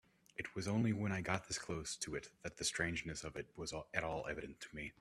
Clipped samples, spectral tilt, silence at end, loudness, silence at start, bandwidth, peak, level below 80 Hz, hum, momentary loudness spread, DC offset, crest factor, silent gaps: under 0.1%; -4 dB/octave; 0.1 s; -42 LUFS; 0.4 s; 14 kHz; -20 dBFS; -64 dBFS; none; 11 LU; under 0.1%; 24 dB; none